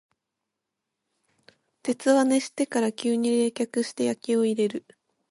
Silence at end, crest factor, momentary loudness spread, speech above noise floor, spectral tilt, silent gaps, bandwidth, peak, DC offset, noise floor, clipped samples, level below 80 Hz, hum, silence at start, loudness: 0.5 s; 18 dB; 7 LU; 60 dB; -4 dB/octave; none; 11.5 kHz; -8 dBFS; under 0.1%; -84 dBFS; under 0.1%; -78 dBFS; none; 1.85 s; -25 LUFS